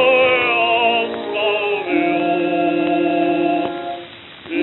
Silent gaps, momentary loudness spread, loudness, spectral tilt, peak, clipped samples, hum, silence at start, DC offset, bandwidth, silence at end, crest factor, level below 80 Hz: none; 13 LU; -17 LUFS; -1.5 dB/octave; -4 dBFS; under 0.1%; none; 0 s; under 0.1%; 4.1 kHz; 0 s; 14 dB; -60 dBFS